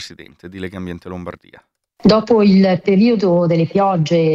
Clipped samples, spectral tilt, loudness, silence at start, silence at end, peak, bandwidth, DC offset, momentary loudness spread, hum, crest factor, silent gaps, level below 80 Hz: under 0.1%; -8 dB/octave; -14 LUFS; 0 s; 0 s; 0 dBFS; 7.6 kHz; under 0.1%; 18 LU; none; 14 dB; none; -48 dBFS